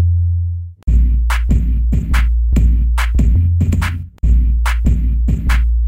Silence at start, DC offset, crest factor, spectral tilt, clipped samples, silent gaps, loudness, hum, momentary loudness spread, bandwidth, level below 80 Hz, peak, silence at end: 0 s; under 0.1%; 12 dB; -6.5 dB/octave; under 0.1%; none; -16 LUFS; none; 4 LU; 10.5 kHz; -14 dBFS; -2 dBFS; 0 s